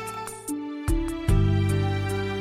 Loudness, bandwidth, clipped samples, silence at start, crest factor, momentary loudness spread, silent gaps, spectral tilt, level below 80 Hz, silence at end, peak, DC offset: -26 LUFS; 15 kHz; under 0.1%; 0 s; 14 dB; 10 LU; none; -6.5 dB/octave; -32 dBFS; 0 s; -10 dBFS; under 0.1%